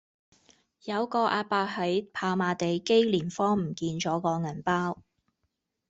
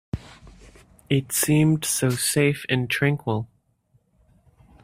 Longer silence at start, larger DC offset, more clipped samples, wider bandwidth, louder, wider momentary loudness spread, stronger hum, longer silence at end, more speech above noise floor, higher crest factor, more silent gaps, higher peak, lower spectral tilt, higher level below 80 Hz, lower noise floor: first, 0.85 s vs 0.15 s; neither; neither; second, 8 kHz vs 16 kHz; second, -28 LUFS vs -22 LUFS; second, 8 LU vs 12 LU; neither; second, 0.9 s vs 1.4 s; first, 52 dB vs 43 dB; about the same, 18 dB vs 20 dB; neither; second, -10 dBFS vs -4 dBFS; about the same, -5.5 dB/octave vs -4.5 dB/octave; second, -66 dBFS vs -52 dBFS; first, -80 dBFS vs -65 dBFS